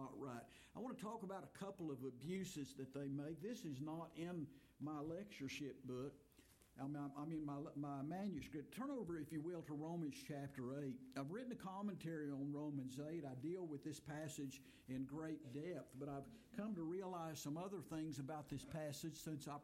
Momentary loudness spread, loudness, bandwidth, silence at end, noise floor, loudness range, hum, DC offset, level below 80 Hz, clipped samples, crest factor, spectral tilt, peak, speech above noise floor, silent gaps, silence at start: 5 LU; -50 LUFS; 16.5 kHz; 0 s; -71 dBFS; 2 LU; none; under 0.1%; -78 dBFS; under 0.1%; 14 dB; -6 dB/octave; -36 dBFS; 22 dB; none; 0 s